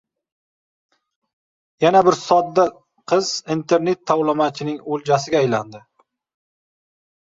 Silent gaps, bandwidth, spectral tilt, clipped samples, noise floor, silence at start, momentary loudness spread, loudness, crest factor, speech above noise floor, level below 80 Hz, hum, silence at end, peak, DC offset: none; 7.8 kHz; -5 dB/octave; under 0.1%; under -90 dBFS; 1.8 s; 9 LU; -19 LUFS; 18 dB; over 72 dB; -64 dBFS; none; 1.45 s; -2 dBFS; under 0.1%